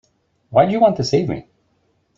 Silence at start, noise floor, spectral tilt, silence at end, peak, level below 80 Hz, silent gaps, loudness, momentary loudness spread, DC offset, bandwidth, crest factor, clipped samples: 0.5 s; -64 dBFS; -6.5 dB/octave; 0.75 s; -2 dBFS; -52 dBFS; none; -17 LUFS; 11 LU; under 0.1%; 7.8 kHz; 18 dB; under 0.1%